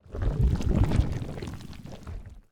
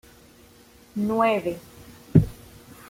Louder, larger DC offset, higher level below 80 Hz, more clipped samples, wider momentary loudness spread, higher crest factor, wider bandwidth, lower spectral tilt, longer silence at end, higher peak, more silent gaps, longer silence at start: second, -28 LUFS vs -24 LUFS; neither; first, -30 dBFS vs -46 dBFS; neither; first, 18 LU vs 14 LU; second, 18 dB vs 24 dB; second, 11 kHz vs 16 kHz; about the same, -8 dB/octave vs -8 dB/octave; second, 0.1 s vs 0.55 s; second, -10 dBFS vs -2 dBFS; neither; second, 0.05 s vs 0.95 s